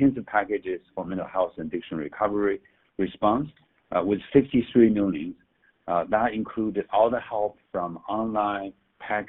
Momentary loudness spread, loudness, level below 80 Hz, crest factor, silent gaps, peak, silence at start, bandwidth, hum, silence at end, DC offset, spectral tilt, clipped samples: 12 LU; -26 LUFS; -56 dBFS; 20 dB; none; -6 dBFS; 0 s; 4 kHz; none; 0 s; under 0.1%; -5.5 dB/octave; under 0.1%